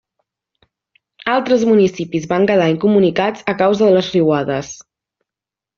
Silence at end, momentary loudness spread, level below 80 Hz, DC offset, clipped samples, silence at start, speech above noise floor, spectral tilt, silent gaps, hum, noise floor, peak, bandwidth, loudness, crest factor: 1.05 s; 10 LU; -56 dBFS; under 0.1%; under 0.1%; 1.2 s; 73 dB; -5 dB/octave; none; none; -87 dBFS; -2 dBFS; 7.2 kHz; -15 LUFS; 14 dB